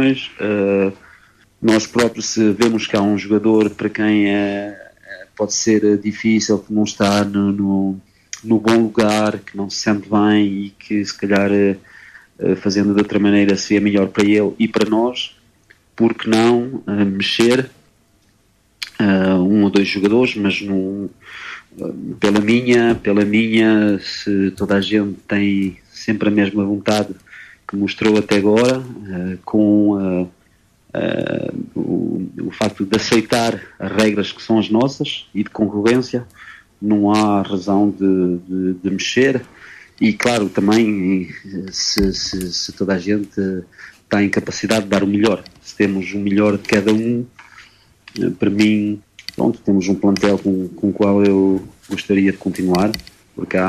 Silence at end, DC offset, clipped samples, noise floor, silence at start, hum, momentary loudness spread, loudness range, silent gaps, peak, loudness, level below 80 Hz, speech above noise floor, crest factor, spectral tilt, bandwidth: 0 s; under 0.1%; under 0.1%; -57 dBFS; 0 s; none; 12 LU; 3 LU; none; -2 dBFS; -17 LUFS; -48 dBFS; 41 dB; 16 dB; -5.5 dB/octave; 13.5 kHz